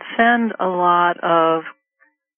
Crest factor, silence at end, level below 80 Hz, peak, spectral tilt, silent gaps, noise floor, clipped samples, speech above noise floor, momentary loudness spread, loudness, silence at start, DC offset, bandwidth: 16 dB; 0.65 s; -66 dBFS; -2 dBFS; 0.5 dB/octave; none; -62 dBFS; under 0.1%; 45 dB; 7 LU; -17 LUFS; 0 s; under 0.1%; 3.6 kHz